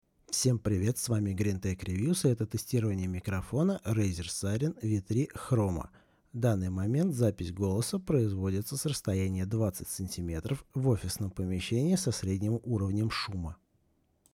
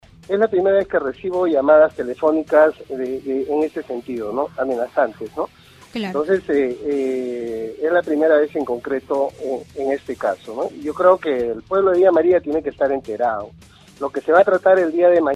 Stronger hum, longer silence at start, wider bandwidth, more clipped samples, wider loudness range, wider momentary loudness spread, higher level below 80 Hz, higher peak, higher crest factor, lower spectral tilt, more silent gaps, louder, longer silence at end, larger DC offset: neither; about the same, 0.3 s vs 0.3 s; first, 16.5 kHz vs 11.5 kHz; neither; second, 2 LU vs 5 LU; second, 7 LU vs 13 LU; about the same, -56 dBFS vs -56 dBFS; second, -14 dBFS vs -2 dBFS; about the same, 16 dB vs 18 dB; about the same, -6 dB/octave vs -6.5 dB/octave; neither; second, -31 LUFS vs -19 LUFS; first, 0.8 s vs 0 s; neither